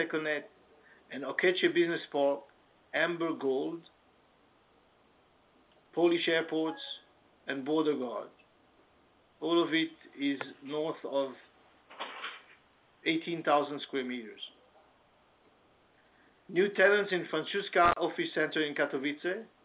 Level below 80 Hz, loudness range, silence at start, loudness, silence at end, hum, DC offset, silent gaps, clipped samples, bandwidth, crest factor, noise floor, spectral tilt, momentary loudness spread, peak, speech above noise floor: -70 dBFS; 7 LU; 0 s; -31 LUFS; 0.2 s; none; under 0.1%; none; under 0.1%; 4 kHz; 22 dB; -66 dBFS; -2 dB/octave; 15 LU; -12 dBFS; 35 dB